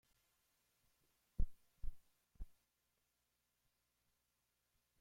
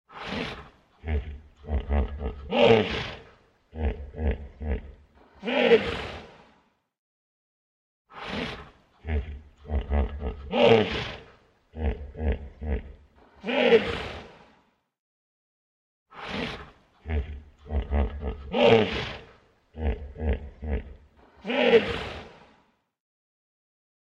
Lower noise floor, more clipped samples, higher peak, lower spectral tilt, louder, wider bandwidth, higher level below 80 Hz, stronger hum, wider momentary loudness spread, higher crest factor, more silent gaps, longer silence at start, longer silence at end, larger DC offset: first, -86 dBFS vs -65 dBFS; neither; second, -24 dBFS vs -6 dBFS; about the same, -7 dB/octave vs -7 dB/octave; second, -55 LUFS vs -27 LUFS; second, 1.8 kHz vs 8 kHz; second, -52 dBFS vs -36 dBFS; first, 60 Hz at -80 dBFS vs none; second, 13 LU vs 22 LU; about the same, 24 dB vs 22 dB; second, none vs 6.98-8.05 s, 14.99-16.06 s; first, 1.4 s vs 0.1 s; first, 2.55 s vs 1.7 s; neither